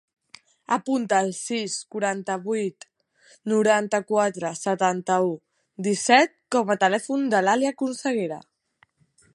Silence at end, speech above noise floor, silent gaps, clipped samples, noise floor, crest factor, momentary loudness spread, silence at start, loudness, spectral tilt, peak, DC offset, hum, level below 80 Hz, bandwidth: 0.95 s; 41 dB; none; under 0.1%; -64 dBFS; 22 dB; 9 LU; 0.7 s; -23 LUFS; -4 dB/octave; -4 dBFS; under 0.1%; none; -76 dBFS; 11.5 kHz